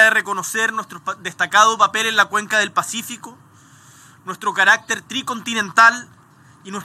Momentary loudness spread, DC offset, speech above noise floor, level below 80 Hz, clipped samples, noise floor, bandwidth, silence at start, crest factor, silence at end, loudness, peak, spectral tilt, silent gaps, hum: 17 LU; under 0.1%; 30 dB; -72 dBFS; under 0.1%; -49 dBFS; 16 kHz; 0 s; 20 dB; 0 s; -17 LUFS; 0 dBFS; -1 dB/octave; none; none